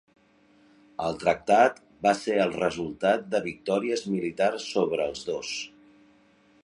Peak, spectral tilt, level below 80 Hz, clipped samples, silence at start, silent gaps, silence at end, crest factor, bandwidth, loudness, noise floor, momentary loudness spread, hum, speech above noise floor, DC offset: -6 dBFS; -4.5 dB/octave; -62 dBFS; under 0.1%; 1 s; none; 0.95 s; 20 dB; 11 kHz; -26 LUFS; -61 dBFS; 11 LU; none; 35 dB; under 0.1%